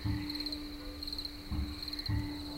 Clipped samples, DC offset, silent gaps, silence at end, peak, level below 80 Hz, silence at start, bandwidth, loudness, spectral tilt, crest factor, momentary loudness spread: under 0.1%; under 0.1%; none; 0 s; -22 dBFS; -44 dBFS; 0 s; 16.5 kHz; -38 LUFS; -5.5 dB/octave; 16 dB; 5 LU